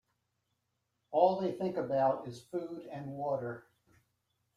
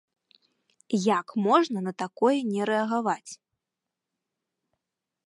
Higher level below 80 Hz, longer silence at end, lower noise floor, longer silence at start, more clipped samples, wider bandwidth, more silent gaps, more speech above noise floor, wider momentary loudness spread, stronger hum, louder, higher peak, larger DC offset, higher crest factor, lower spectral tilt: about the same, -78 dBFS vs -82 dBFS; second, 0.95 s vs 1.95 s; second, -82 dBFS vs -87 dBFS; first, 1.1 s vs 0.9 s; neither; about the same, 11.5 kHz vs 11.5 kHz; neither; second, 49 dB vs 62 dB; first, 14 LU vs 11 LU; neither; second, -34 LUFS vs -26 LUFS; second, -14 dBFS vs -6 dBFS; neither; about the same, 22 dB vs 22 dB; first, -7.5 dB/octave vs -5.5 dB/octave